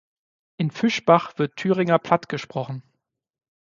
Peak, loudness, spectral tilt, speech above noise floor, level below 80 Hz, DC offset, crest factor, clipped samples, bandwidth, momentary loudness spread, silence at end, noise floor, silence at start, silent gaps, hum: -2 dBFS; -22 LUFS; -6.5 dB/octave; 54 dB; -66 dBFS; under 0.1%; 22 dB; under 0.1%; 7.4 kHz; 12 LU; 0.8 s; -75 dBFS; 0.6 s; none; none